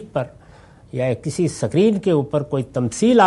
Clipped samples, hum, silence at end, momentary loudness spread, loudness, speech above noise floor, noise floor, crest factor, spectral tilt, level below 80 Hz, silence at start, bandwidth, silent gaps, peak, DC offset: under 0.1%; none; 0 s; 10 LU; -20 LUFS; 28 dB; -46 dBFS; 18 dB; -6.5 dB/octave; -52 dBFS; 0 s; 11.5 kHz; none; -2 dBFS; under 0.1%